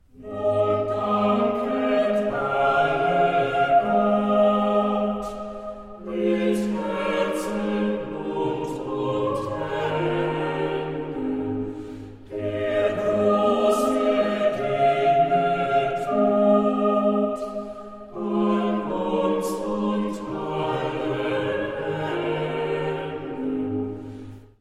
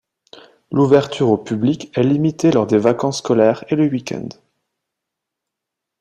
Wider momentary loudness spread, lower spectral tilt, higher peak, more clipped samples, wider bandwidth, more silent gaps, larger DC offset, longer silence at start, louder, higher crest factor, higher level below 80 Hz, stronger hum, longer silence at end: first, 12 LU vs 9 LU; about the same, -6.5 dB/octave vs -7 dB/octave; second, -8 dBFS vs -2 dBFS; neither; first, 14 kHz vs 10 kHz; neither; neither; second, 0.15 s vs 0.7 s; second, -23 LUFS vs -17 LUFS; about the same, 16 dB vs 16 dB; first, -52 dBFS vs -58 dBFS; neither; second, 0.2 s vs 1.7 s